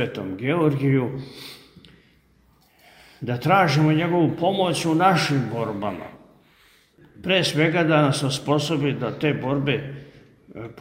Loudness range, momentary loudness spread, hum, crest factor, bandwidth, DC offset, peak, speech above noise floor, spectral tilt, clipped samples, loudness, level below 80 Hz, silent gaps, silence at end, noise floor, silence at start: 4 LU; 18 LU; none; 18 dB; 16 kHz; under 0.1%; -6 dBFS; 37 dB; -6 dB/octave; under 0.1%; -21 LUFS; -58 dBFS; none; 0 s; -59 dBFS; 0 s